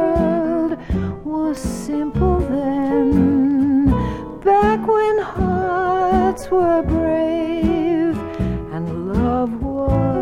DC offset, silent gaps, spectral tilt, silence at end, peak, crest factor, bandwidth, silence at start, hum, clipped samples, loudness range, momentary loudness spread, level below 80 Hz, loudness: under 0.1%; none; -8 dB/octave; 0 s; -4 dBFS; 14 dB; 12.5 kHz; 0 s; none; under 0.1%; 3 LU; 8 LU; -30 dBFS; -19 LUFS